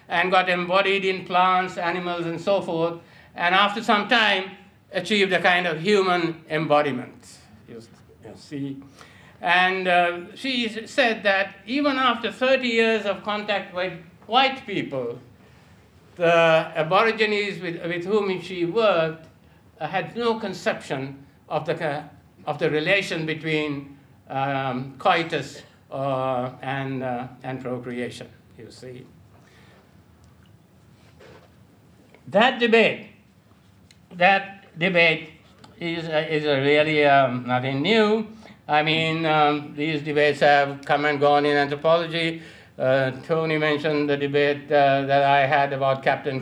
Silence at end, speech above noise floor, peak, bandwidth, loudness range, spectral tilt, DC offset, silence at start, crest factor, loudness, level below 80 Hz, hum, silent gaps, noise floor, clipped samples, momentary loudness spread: 0 s; 33 dB; -2 dBFS; 12.5 kHz; 7 LU; -5.5 dB/octave; under 0.1%; 0.1 s; 22 dB; -22 LUFS; -66 dBFS; none; none; -55 dBFS; under 0.1%; 14 LU